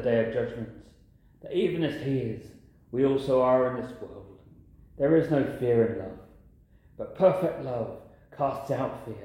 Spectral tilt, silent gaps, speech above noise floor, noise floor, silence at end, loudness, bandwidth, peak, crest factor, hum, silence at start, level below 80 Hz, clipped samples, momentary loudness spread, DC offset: -8.5 dB/octave; none; 30 dB; -57 dBFS; 0 s; -27 LUFS; 16 kHz; -10 dBFS; 18 dB; none; 0 s; -56 dBFS; under 0.1%; 18 LU; under 0.1%